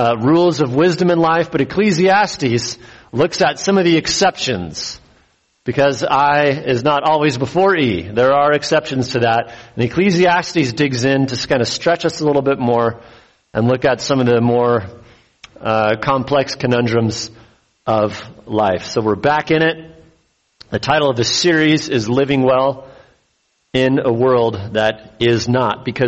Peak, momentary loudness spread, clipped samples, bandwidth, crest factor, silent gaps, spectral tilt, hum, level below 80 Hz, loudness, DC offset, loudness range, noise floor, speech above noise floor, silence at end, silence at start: -2 dBFS; 9 LU; under 0.1%; 8.4 kHz; 14 dB; none; -5 dB/octave; none; -48 dBFS; -16 LUFS; under 0.1%; 3 LU; -63 dBFS; 48 dB; 0 s; 0 s